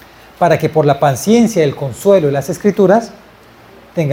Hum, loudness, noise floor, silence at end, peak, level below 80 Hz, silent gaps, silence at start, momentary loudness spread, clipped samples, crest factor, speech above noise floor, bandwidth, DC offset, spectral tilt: none; -13 LUFS; -41 dBFS; 0 s; 0 dBFS; -50 dBFS; none; 0.4 s; 6 LU; under 0.1%; 14 dB; 29 dB; 17 kHz; under 0.1%; -6.5 dB/octave